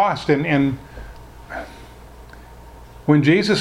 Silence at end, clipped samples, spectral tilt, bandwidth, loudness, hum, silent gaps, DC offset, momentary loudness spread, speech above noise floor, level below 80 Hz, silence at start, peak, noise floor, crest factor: 0 s; under 0.1%; -6.5 dB/octave; 11.5 kHz; -18 LUFS; none; none; under 0.1%; 24 LU; 24 dB; -42 dBFS; 0 s; -2 dBFS; -41 dBFS; 18 dB